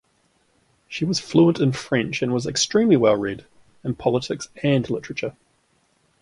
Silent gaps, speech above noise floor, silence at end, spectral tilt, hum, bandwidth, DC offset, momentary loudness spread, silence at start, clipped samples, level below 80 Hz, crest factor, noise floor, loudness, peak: none; 44 dB; 0.9 s; -5 dB/octave; none; 11.5 kHz; under 0.1%; 13 LU; 0.9 s; under 0.1%; -56 dBFS; 18 dB; -65 dBFS; -21 LUFS; -4 dBFS